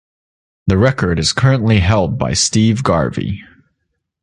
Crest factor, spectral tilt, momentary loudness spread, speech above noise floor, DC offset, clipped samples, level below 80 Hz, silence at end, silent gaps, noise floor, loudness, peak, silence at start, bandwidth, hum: 14 dB; -5 dB/octave; 10 LU; 58 dB; under 0.1%; under 0.1%; -32 dBFS; 0.8 s; none; -71 dBFS; -15 LUFS; -2 dBFS; 0.65 s; 11.5 kHz; none